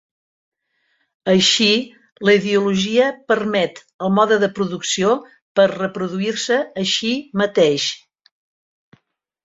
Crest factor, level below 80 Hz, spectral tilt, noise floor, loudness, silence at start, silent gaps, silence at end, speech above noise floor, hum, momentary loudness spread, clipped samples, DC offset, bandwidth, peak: 18 dB; -62 dBFS; -4 dB/octave; -67 dBFS; -18 LUFS; 1.25 s; 3.94-3.99 s, 5.42-5.55 s; 1.45 s; 50 dB; none; 9 LU; under 0.1%; under 0.1%; 7.8 kHz; -2 dBFS